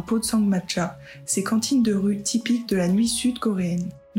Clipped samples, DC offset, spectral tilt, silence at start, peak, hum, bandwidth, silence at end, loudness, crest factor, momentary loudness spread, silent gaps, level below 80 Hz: under 0.1%; under 0.1%; -4.5 dB/octave; 0 s; -12 dBFS; none; 16.5 kHz; 0 s; -23 LUFS; 12 dB; 6 LU; none; -54 dBFS